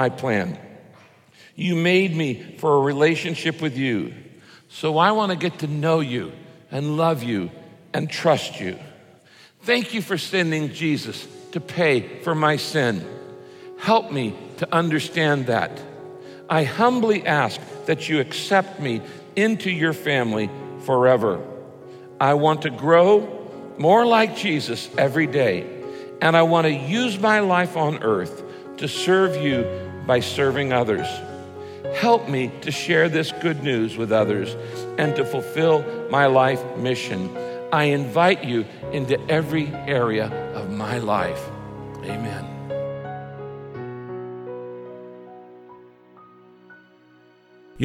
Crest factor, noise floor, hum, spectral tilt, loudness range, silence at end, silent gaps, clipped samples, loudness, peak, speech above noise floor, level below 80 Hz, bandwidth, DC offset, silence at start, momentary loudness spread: 20 dB; -53 dBFS; none; -5.5 dB/octave; 8 LU; 0 s; none; under 0.1%; -21 LUFS; -4 dBFS; 33 dB; -60 dBFS; 16.5 kHz; under 0.1%; 0 s; 17 LU